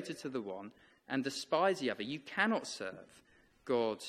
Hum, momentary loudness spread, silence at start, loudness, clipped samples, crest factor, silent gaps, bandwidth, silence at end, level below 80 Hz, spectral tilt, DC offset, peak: none; 15 LU; 0 s; -36 LUFS; under 0.1%; 22 dB; none; 14 kHz; 0 s; -78 dBFS; -4 dB/octave; under 0.1%; -16 dBFS